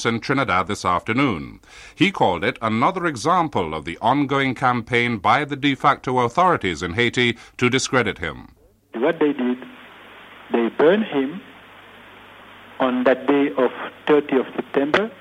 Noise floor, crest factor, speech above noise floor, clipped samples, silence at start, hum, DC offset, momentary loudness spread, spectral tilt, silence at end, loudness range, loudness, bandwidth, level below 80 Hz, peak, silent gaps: -44 dBFS; 16 dB; 24 dB; under 0.1%; 0 s; none; under 0.1%; 7 LU; -5 dB/octave; 0.05 s; 4 LU; -20 LUFS; 12 kHz; -52 dBFS; -4 dBFS; none